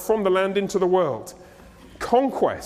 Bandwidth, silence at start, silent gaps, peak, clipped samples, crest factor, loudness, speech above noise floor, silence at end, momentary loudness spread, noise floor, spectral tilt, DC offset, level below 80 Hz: 15.5 kHz; 0 s; none; -6 dBFS; under 0.1%; 18 dB; -22 LUFS; 25 dB; 0 s; 14 LU; -46 dBFS; -5.5 dB/octave; under 0.1%; -54 dBFS